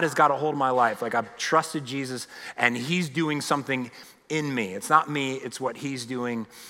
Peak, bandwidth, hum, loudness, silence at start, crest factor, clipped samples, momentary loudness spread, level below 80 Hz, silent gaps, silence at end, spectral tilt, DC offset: -4 dBFS; 16.5 kHz; none; -26 LUFS; 0 s; 22 dB; under 0.1%; 10 LU; -76 dBFS; none; 0 s; -4.5 dB/octave; under 0.1%